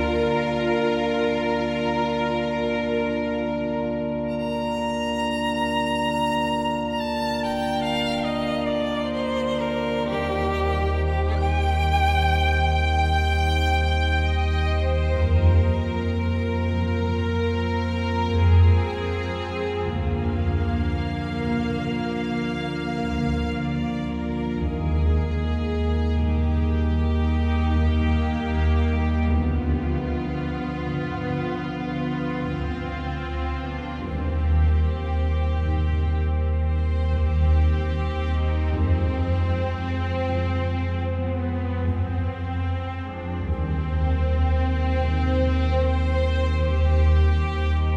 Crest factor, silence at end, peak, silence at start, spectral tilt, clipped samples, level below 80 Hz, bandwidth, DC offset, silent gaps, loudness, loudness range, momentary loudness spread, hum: 14 dB; 0 s; -8 dBFS; 0 s; -7.5 dB/octave; under 0.1%; -30 dBFS; 8 kHz; under 0.1%; none; -24 LUFS; 4 LU; 6 LU; none